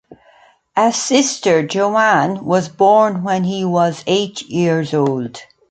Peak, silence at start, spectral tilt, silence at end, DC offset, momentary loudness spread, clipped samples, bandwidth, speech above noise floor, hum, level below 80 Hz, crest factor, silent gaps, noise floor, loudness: 0 dBFS; 0.1 s; -4.5 dB/octave; 0.3 s; under 0.1%; 6 LU; under 0.1%; 9.4 kHz; 35 dB; none; -62 dBFS; 16 dB; none; -50 dBFS; -16 LUFS